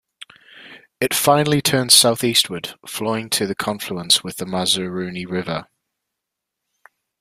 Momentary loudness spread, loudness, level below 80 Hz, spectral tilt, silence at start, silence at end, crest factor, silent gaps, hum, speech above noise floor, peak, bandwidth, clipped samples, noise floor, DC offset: 15 LU; -18 LUFS; -58 dBFS; -2.5 dB/octave; 0.55 s; 1.55 s; 22 dB; none; none; 62 dB; 0 dBFS; 16 kHz; under 0.1%; -81 dBFS; under 0.1%